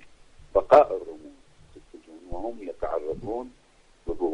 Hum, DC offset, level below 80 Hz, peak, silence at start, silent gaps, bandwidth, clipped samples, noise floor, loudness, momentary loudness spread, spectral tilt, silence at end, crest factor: none; under 0.1%; -46 dBFS; -4 dBFS; 0.05 s; none; 9.6 kHz; under 0.1%; -52 dBFS; -25 LUFS; 24 LU; -7 dB/octave; 0 s; 22 dB